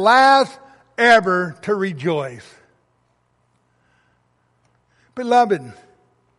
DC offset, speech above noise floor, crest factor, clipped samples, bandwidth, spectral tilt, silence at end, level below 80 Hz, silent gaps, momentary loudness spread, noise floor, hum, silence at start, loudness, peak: under 0.1%; 48 dB; 18 dB; under 0.1%; 11.5 kHz; -4.5 dB/octave; 0.65 s; -66 dBFS; none; 18 LU; -64 dBFS; none; 0 s; -17 LUFS; -2 dBFS